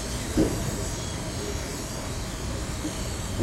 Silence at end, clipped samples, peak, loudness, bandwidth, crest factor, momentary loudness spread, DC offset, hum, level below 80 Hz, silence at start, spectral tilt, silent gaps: 0 s; under 0.1%; -10 dBFS; -30 LUFS; 16 kHz; 20 dB; 7 LU; under 0.1%; none; -36 dBFS; 0 s; -4.5 dB/octave; none